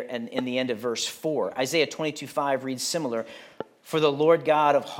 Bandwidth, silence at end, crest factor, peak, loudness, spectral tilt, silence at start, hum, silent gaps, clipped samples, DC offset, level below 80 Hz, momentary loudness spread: 17 kHz; 0 s; 18 dB; -8 dBFS; -25 LUFS; -4 dB/octave; 0 s; none; none; under 0.1%; under 0.1%; -76 dBFS; 11 LU